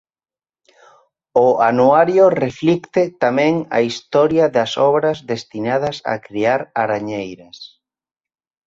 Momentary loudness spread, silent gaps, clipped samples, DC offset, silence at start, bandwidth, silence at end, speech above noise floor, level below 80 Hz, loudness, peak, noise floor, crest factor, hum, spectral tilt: 12 LU; none; under 0.1%; under 0.1%; 1.35 s; 7.8 kHz; 1 s; over 74 dB; -58 dBFS; -17 LUFS; -2 dBFS; under -90 dBFS; 16 dB; none; -6 dB/octave